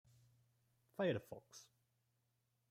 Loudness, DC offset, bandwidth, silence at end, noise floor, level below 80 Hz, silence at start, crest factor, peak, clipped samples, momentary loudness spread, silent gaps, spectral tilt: -42 LUFS; under 0.1%; 16 kHz; 1.1 s; -84 dBFS; -86 dBFS; 1 s; 20 dB; -28 dBFS; under 0.1%; 20 LU; none; -6 dB/octave